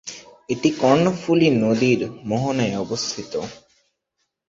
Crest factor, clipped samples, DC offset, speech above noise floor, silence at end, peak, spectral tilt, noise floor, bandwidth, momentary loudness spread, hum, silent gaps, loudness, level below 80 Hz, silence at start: 18 dB; under 0.1%; under 0.1%; 56 dB; 0.95 s; -2 dBFS; -5.5 dB/octave; -75 dBFS; 7.8 kHz; 13 LU; none; none; -20 LUFS; -58 dBFS; 0.05 s